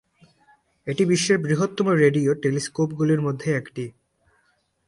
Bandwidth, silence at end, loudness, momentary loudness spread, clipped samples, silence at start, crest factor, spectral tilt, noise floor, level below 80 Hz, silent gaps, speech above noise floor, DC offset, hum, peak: 11.5 kHz; 1 s; -22 LUFS; 14 LU; under 0.1%; 0.85 s; 18 dB; -5.5 dB/octave; -67 dBFS; -62 dBFS; none; 46 dB; under 0.1%; none; -6 dBFS